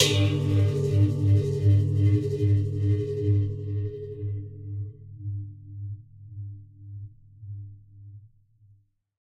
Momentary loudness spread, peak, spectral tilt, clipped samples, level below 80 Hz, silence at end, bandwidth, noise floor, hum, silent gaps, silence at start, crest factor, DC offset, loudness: 21 LU; -6 dBFS; -6 dB/octave; under 0.1%; -52 dBFS; 0.95 s; 12.5 kHz; -61 dBFS; none; none; 0 s; 20 dB; under 0.1%; -25 LUFS